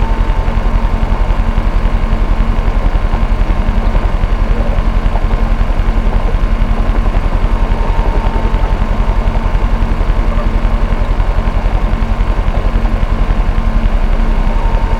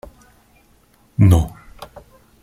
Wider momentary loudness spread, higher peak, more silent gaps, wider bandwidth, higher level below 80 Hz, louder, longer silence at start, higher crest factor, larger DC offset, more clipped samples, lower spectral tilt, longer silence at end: second, 1 LU vs 26 LU; about the same, 0 dBFS vs -2 dBFS; neither; second, 5.8 kHz vs 14.5 kHz; first, -12 dBFS vs -34 dBFS; about the same, -16 LUFS vs -17 LUFS; second, 0 s vs 1.2 s; second, 10 dB vs 18 dB; neither; neither; about the same, -7.5 dB/octave vs -8 dB/octave; second, 0 s vs 0.6 s